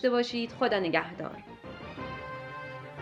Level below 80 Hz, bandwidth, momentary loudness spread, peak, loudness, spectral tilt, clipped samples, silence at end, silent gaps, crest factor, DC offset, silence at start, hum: -62 dBFS; 8.4 kHz; 16 LU; -10 dBFS; -32 LUFS; -5.5 dB/octave; under 0.1%; 0 s; none; 22 dB; under 0.1%; 0 s; none